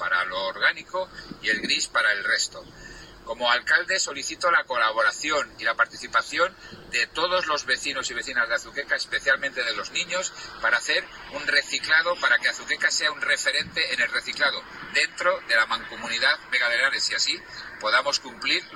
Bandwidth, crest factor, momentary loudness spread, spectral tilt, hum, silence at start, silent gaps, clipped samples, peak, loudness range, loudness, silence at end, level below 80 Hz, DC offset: 15.5 kHz; 18 dB; 9 LU; 0 dB/octave; none; 0 s; none; under 0.1%; -6 dBFS; 3 LU; -23 LUFS; 0 s; -58 dBFS; under 0.1%